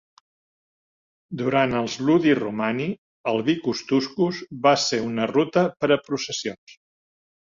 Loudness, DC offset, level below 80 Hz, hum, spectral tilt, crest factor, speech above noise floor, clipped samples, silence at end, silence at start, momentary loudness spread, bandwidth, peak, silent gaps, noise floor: -23 LUFS; under 0.1%; -62 dBFS; none; -5 dB/octave; 18 dB; over 68 dB; under 0.1%; 0.75 s; 1.3 s; 9 LU; 7.6 kHz; -6 dBFS; 2.98-3.24 s, 6.58-6.67 s; under -90 dBFS